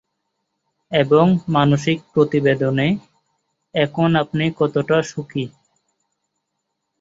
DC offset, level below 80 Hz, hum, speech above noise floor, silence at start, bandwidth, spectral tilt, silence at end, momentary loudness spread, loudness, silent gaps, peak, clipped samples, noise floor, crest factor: under 0.1%; -56 dBFS; none; 59 dB; 0.9 s; 8 kHz; -7 dB/octave; 1.5 s; 11 LU; -18 LUFS; none; -2 dBFS; under 0.1%; -76 dBFS; 18 dB